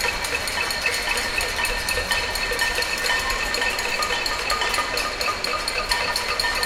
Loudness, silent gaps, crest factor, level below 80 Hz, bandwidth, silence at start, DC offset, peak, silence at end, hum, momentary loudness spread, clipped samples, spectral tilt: -22 LUFS; none; 18 dB; -38 dBFS; 17 kHz; 0 s; under 0.1%; -4 dBFS; 0 s; none; 2 LU; under 0.1%; -1 dB/octave